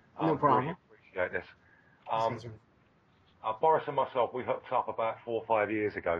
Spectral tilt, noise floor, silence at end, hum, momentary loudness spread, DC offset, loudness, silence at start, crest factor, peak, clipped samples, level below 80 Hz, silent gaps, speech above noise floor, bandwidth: -7.5 dB/octave; -66 dBFS; 0 s; none; 13 LU; under 0.1%; -31 LUFS; 0.15 s; 20 dB; -12 dBFS; under 0.1%; -68 dBFS; none; 35 dB; 7.4 kHz